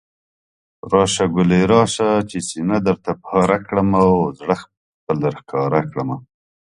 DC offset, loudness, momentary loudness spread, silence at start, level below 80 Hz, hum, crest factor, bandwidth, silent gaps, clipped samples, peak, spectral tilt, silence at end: under 0.1%; -18 LUFS; 10 LU; 0.85 s; -46 dBFS; none; 18 dB; 11.5 kHz; 4.77-5.07 s; under 0.1%; 0 dBFS; -6 dB/octave; 0.5 s